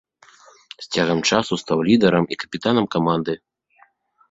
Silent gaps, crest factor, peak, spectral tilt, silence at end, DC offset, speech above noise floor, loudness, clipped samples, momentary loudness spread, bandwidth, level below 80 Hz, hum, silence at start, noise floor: none; 20 dB; -2 dBFS; -5 dB/octave; 0.95 s; under 0.1%; 38 dB; -20 LUFS; under 0.1%; 10 LU; 7.8 kHz; -56 dBFS; none; 0.8 s; -58 dBFS